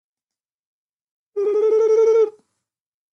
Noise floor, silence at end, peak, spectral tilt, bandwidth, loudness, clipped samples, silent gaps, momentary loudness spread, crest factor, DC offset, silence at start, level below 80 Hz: under -90 dBFS; 0.85 s; -10 dBFS; -3.5 dB/octave; 6.6 kHz; -18 LUFS; under 0.1%; none; 9 LU; 12 dB; under 0.1%; 1.35 s; -76 dBFS